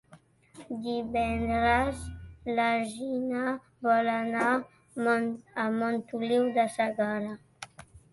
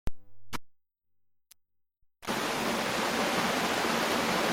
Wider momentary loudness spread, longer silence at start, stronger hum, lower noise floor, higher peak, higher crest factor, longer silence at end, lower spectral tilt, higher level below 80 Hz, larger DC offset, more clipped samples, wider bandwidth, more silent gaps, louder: about the same, 15 LU vs 16 LU; about the same, 0.1 s vs 0.05 s; neither; second, -58 dBFS vs -75 dBFS; about the same, -14 dBFS vs -16 dBFS; about the same, 16 dB vs 16 dB; first, 0.15 s vs 0 s; first, -5.5 dB/octave vs -3 dB/octave; about the same, -50 dBFS vs -52 dBFS; neither; neither; second, 11.5 kHz vs 16.5 kHz; neither; about the same, -29 LUFS vs -29 LUFS